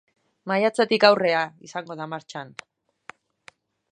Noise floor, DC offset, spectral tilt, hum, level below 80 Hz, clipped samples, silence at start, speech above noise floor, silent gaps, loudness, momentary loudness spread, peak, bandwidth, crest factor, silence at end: -54 dBFS; under 0.1%; -4.5 dB/octave; none; -76 dBFS; under 0.1%; 0.45 s; 32 dB; none; -22 LUFS; 21 LU; -2 dBFS; 10 kHz; 24 dB; 1.4 s